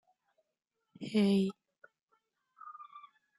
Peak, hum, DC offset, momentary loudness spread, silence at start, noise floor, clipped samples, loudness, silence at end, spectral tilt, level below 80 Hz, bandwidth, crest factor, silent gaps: -18 dBFS; none; under 0.1%; 24 LU; 1 s; -86 dBFS; under 0.1%; -31 LUFS; 0.4 s; -7 dB/octave; -80 dBFS; 12 kHz; 18 dB; 2.03-2.08 s